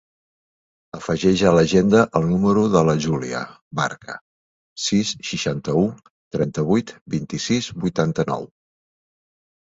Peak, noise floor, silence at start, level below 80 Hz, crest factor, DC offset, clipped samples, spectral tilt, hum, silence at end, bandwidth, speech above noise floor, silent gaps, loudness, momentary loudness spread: -2 dBFS; under -90 dBFS; 0.95 s; -50 dBFS; 20 dB; under 0.1%; under 0.1%; -5.5 dB/octave; none; 1.25 s; 8 kHz; over 70 dB; 3.61-3.71 s, 4.21-4.76 s, 6.10-6.31 s, 7.01-7.06 s; -20 LUFS; 14 LU